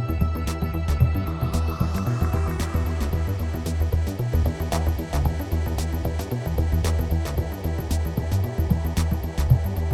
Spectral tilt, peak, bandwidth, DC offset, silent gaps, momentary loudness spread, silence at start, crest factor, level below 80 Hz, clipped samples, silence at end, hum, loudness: -7 dB/octave; -6 dBFS; 15 kHz; under 0.1%; none; 5 LU; 0 s; 18 dB; -26 dBFS; under 0.1%; 0 s; none; -25 LUFS